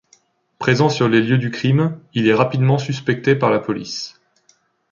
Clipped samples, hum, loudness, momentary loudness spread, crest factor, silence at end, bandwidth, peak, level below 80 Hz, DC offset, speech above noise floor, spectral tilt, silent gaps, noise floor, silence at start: under 0.1%; none; -18 LUFS; 9 LU; 16 dB; 0.8 s; 7.4 kHz; -2 dBFS; -58 dBFS; under 0.1%; 43 dB; -6.5 dB/octave; none; -60 dBFS; 0.6 s